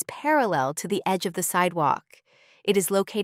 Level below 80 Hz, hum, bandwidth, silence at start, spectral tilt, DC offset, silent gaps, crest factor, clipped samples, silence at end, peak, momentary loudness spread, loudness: -70 dBFS; none; 16 kHz; 0 s; -4 dB/octave; under 0.1%; none; 16 dB; under 0.1%; 0 s; -8 dBFS; 5 LU; -24 LUFS